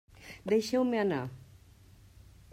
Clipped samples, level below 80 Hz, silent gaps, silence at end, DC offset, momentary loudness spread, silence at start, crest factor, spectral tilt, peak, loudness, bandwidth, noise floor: under 0.1%; -62 dBFS; none; 1.15 s; under 0.1%; 20 LU; 0.2 s; 18 dB; -6 dB/octave; -16 dBFS; -30 LUFS; 16 kHz; -57 dBFS